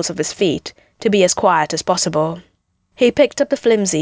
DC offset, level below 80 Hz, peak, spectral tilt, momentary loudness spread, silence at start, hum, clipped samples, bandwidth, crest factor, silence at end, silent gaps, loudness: under 0.1%; -52 dBFS; 0 dBFS; -4 dB/octave; 9 LU; 0 s; none; under 0.1%; 8 kHz; 16 dB; 0 s; none; -16 LUFS